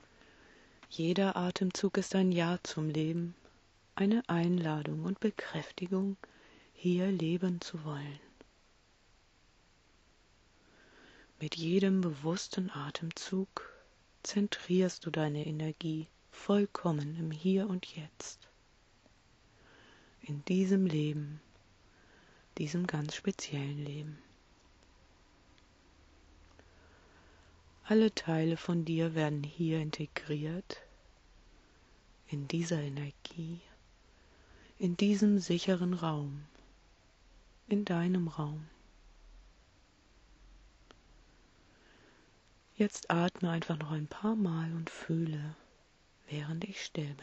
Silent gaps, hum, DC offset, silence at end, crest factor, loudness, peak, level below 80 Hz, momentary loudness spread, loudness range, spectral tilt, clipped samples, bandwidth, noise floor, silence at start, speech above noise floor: none; none; under 0.1%; 0 s; 22 dB; -34 LUFS; -14 dBFS; -66 dBFS; 14 LU; 8 LU; -6.5 dB/octave; under 0.1%; 8.2 kHz; -67 dBFS; 0.8 s; 33 dB